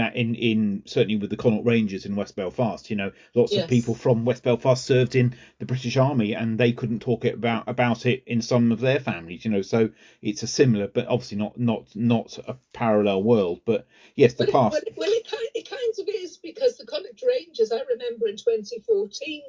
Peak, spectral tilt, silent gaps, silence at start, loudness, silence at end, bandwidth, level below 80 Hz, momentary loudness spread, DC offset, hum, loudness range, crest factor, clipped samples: -2 dBFS; -6.5 dB/octave; none; 0 s; -24 LUFS; 0 s; 7.6 kHz; -60 dBFS; 10 LU; under 0.1%; none; 4 LU; 20 dB; under 0.1%